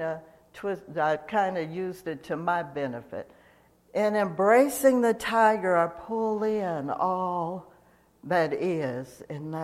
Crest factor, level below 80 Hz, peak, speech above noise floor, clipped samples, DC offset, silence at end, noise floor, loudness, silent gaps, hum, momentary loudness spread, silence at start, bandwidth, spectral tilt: 20 dB; -66 dBFS; -8 dBFS; 34 dB; under 0.1%; under 0.1%; 0 s; -60 dBFS; -27 LUFS; none; none; 15 LU; 0 s; 15.5 kHz; -5.5 dB/octave